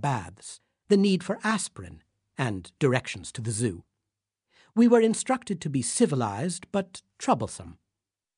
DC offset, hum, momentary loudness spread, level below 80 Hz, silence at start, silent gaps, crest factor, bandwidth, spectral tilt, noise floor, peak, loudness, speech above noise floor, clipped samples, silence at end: under 0.1%; none; 20 LU; -62 dBFS; 0 s; none; 20 dB; 11 kHz; -5 dB/octave; -87 dBFS; -6 dBFS; -27 LUFS; 61 dB; under 0.1%; 0.65 s